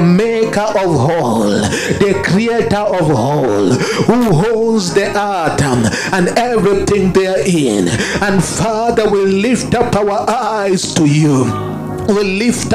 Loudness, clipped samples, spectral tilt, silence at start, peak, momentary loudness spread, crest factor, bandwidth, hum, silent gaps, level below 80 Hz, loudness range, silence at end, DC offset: -13 LUFS; under 0.1%; -5.5 dB/octave; 0 s; 0 dBFS; 3 LU; 12 dB; 15.5 kHz; none; none; -38 dBFS; 1 LU; 0 s; under 0.1%